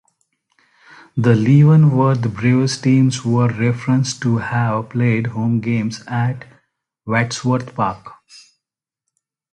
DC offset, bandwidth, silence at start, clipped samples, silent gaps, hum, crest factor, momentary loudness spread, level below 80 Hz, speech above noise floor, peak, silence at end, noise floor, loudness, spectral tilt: under 0.1%; 10 kHz; 1.15 s; under 0.1%; none; none; 16 dB; 11 LU; -52 dBFS; 69 dB; -2 dBFS; 1.4 s; -84 dBFS; -17 LUFS; -7 dB/octave